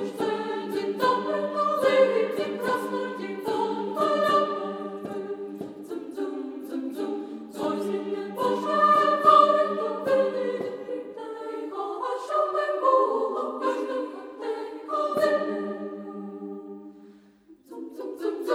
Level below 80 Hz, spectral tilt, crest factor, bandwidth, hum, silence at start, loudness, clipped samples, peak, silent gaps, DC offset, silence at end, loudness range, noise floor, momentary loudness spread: -76 dBFS; -5 dB/octave; 22 dB; 16 kHz; none; 0 s; -26 LUFS; under 0.1%; -6 dBFS; none; under 0.1%; 0 s; 9 LU; -55 dBFS; 16 LU